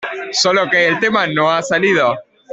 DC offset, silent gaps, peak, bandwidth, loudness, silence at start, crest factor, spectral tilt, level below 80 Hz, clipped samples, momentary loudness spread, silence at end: under 0.1%; none; -2 dBFS; 8.4 kHz; -14 LUFS; 0 s; 12 dB; -3 dB/octave; -60 dBFS; under 0.1%; 5 LU; 0 s